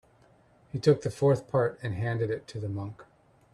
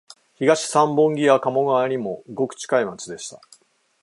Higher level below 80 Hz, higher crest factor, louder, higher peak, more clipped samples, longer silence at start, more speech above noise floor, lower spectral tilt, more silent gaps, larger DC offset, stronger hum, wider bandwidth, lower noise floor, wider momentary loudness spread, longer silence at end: first, -62 dBFS vs -70 dBFS; about the same, 20 dB vs 20 dB; second, -29 LUFS vs -20 LUFS; second, -10 dBFS vs -2 dBFS; neither; first, 0.75 s vs 0.4 s; about the same, 33 dB vs 35 dB; first, -7.5 dB/octave vs -4.5 dB/octave; neither; neither; neither; about the same, 12 kHz vs 11.5 kHz; first, -61 dBFS vs -55 dBFS; second, 12 LU vs 15 LU; second, 0.5 s vs 0.65 s